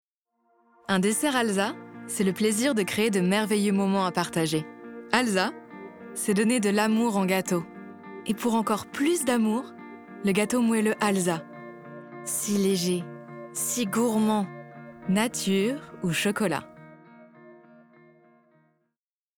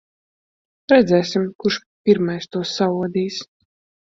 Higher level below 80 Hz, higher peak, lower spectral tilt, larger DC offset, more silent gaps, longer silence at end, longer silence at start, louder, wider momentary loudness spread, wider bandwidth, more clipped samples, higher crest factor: second, -68 dBFS vs -60 dBFS; about the same, -4 dBFS vs -2 dBFS; second, -4.5 dB/octave vs -6 dB/octave; neither; second, none vs 1.55-1.59 s, 1.86-2.04 s; first, 1.85 s vs 0.7 s; about the same, 0.9 s vs 0.9 s; second, -26 LUFS vs -19 LUFS; first, 19 LU vs 11 LU; first, 19.5 kHz vs 7.8 kHz; neither; about the same, 22 dB vs 18 dB